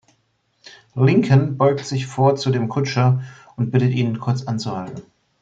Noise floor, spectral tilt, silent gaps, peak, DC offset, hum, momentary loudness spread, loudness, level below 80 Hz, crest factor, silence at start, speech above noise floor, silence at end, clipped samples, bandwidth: -66 dBFS; -7.5 dB/octave; none; -4 dBFS; under 0.1%; none; 13 LU; -19 LUFS; -60 dBFS; 16 dB; 0.65 s; 48 dB; 0.4 s; under 0.1%; 7.8 kHz